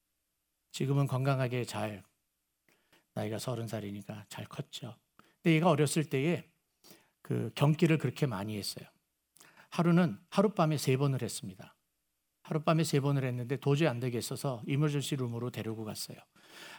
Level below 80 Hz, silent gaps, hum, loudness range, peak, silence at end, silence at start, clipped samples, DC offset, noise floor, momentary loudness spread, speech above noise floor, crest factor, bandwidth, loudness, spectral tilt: -76 dBFS; none; none; 6 LU; -12 dBFS; 0 s; 0.75 s; under 0.1%; under 0.1%; -82 dBFS; 15 LU; 51 dB; 20 dB; over 20 kHz; -32 LUFS; -6 dB/octave